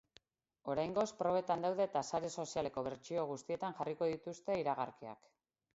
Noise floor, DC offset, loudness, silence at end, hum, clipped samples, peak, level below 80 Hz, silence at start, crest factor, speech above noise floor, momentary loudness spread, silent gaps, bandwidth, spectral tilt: -70 dBFS; under 0.1%; -39 LUFS; 0.6 s; none; under 0.1%; -22 dBFS; -72 dBFS; 0.65 s; 18 dB; 32 dB; 9 LU; none; 7.6 kHz; -5 dB/octave